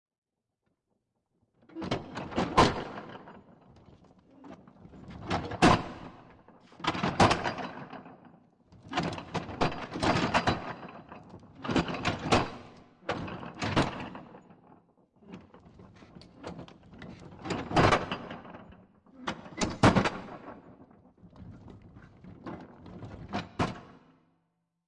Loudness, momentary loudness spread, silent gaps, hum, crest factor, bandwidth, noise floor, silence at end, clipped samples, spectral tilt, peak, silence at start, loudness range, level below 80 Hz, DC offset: -30 LUFS; 26 LU; none; none; 22 dB; 11.5 kHz; -81 dBFS; 0.95 s; under 0.1%; -5 dB/octave; -10 dBFS; 1.75 s; 12 LU; -52 dBFS; under 0.1%